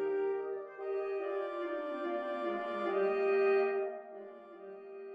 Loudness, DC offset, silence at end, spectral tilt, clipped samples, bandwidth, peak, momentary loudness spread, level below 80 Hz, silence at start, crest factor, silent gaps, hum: -35 LUFS; under 0.1%; 0 s; -6.5 dB/octave; under 0.1%; 5 kHz; -20 dBFS; 19 LU; -88 dBFS; 0 s; 16 dB; none; none